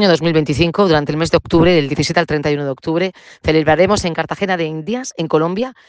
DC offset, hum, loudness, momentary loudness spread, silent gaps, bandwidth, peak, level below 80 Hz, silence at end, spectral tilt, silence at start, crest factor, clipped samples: under 0.1%; none; -16 LUFS; 8 LU; none; 9.8 kHz; 0 dBFS; -40 dBFS; 0.15 s; -5.5 dB/octave; 0 s; 16 dB; under 0.1%